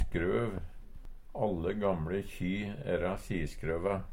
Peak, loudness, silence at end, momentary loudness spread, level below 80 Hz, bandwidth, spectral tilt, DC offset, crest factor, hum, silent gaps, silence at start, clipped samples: -18 dBFS; -35 LUFS; 0 s; 6 LU; -44 dBFS; 16.5 kHz; -7.5 dB/octave; under 0.1%; 16 dB; none; none; 0 s; under 0.1%